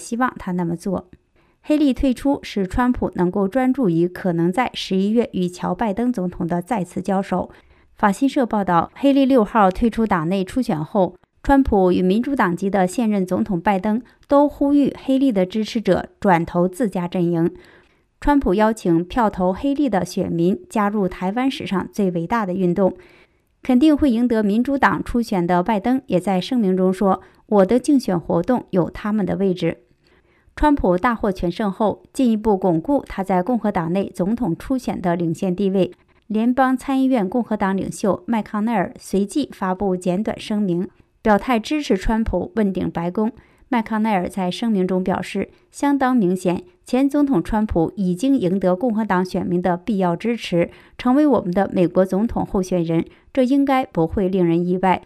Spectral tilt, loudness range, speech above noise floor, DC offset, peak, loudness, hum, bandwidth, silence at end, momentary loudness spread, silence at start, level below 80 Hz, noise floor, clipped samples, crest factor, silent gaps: -7 dB/octave; 3 LU; 38 dB; under 0.1%; -2 dBFS; -20 LUFS; none; 14 kHz; 0.05 s; 7 LU; 0 s; -40 dBFS; -57 dBFS; under 0.1%; 16 dB; none